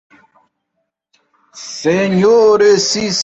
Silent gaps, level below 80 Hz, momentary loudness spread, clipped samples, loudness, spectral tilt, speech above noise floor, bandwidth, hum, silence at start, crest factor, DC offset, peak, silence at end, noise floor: none; -54 dBFS; 15 LU; under 0.1%; -12 LUFS; -4 dB/octave; 60 dB; 8.2 kHz; none; 1.55 s; 14 dB; under 0.1%; -2 dBFS; 0 s; -72 dBFS